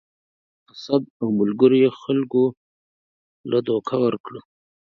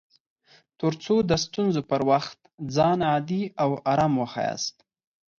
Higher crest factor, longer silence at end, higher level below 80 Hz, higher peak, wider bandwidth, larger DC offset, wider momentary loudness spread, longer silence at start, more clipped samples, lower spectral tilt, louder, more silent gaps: about the same, 20 dB vs 18 dB; second, 0.5 s vs 0.7 s; second, -68 dBFS vs -56 dBFS; first, -2 dBFS vs -8 dBFS; second, 6.4 kHz vs 7.6 kHz; neither; first, 21 LU vs 7 LU; about the same, 0.75 s vs 0.8 s; neither; first, -8 dB/octave vs -5.5 dB/octave; first, -21 LUFS vs -25 LUFS; first, 1.10-1.20 s, 2.57-3.44 s, 4.20-4.24 s vs 2.54-2.58 s